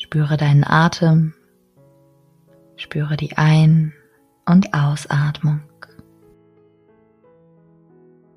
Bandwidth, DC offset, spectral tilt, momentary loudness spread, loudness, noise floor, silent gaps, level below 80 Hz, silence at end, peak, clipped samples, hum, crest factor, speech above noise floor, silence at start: 10.5 kHz; under 0.1%; -7 dB/octave; 12 LU; -17 LUFS; -55 dBFS; none; -54 dBFS; 2.75 s; 0 dBFS; under 0.1%; none; 18 dB; 39 dB; 0 s